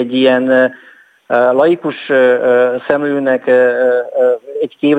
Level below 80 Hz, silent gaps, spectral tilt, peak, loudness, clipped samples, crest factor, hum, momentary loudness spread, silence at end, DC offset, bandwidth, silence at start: -64 dBFS; none; -7 dB/octave; 0 dBFS; -13 LUFS; under 0.1%; 12 dB; none; 6 LU; 0 s; under 0.1%; 4.7 kHz; 0 s